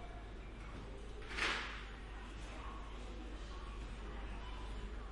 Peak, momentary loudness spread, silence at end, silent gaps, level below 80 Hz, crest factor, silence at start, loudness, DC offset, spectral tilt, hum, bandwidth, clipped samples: -24 dBFS; 13 LU; 0 s; none; -48 dBFS; 22 dB; 0 s; -46 LUFS; under 0.1%; -4 dB/octave; none; 11.5 kHz; under 0.1%